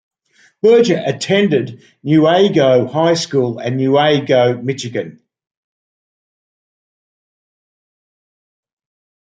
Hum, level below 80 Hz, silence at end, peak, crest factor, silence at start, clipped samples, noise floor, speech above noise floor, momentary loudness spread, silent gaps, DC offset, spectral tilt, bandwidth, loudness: none; -62 dBFS; 4.1 s; -2 dBFS; 16 dB; 0.65 s; under 0.1%; under -90 dBFS; over 76 dB; 11 LU; none; under 0.1%; -6 dB/octave; 9.2 kHz; -14 LUFS